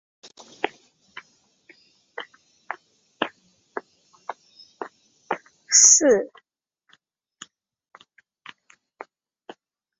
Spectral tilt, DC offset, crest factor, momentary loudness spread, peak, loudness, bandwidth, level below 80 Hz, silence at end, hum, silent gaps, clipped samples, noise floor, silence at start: -0.5 dB/octave; under 0.1%; 26 dB; 31 LU; -2 dBFS; -18 LUFS; 8 kHz; -76 dBFS; 3.75 s; none; none; under 0.1%; -63 dBFS; 0.65 s